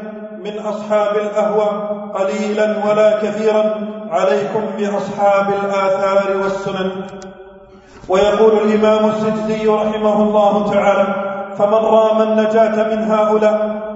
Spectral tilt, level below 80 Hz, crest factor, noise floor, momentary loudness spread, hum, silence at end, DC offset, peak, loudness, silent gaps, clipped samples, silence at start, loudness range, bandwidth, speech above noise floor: -6 dB/octave; -52 dBFS; 14 dB; -40 dBFS; 10 LU; none; 0 s; under 0.1%; 0 dBFS; -15 LUFS; none; under 0.1%; 0 s; 3 LU; 8 kHz; 26 dB